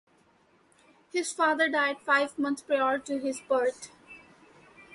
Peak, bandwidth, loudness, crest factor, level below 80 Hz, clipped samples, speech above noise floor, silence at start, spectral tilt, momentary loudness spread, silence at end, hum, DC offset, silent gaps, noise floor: -12 dBFS; 11.5 kHz; -28 LUFS; 18 dB; -76 dBFS; under 0.1%; 37 dB; 1.15 s; -2 dB/octave; 8 LU; 0.15 s; none; under 0.1%; none; -64 dBFS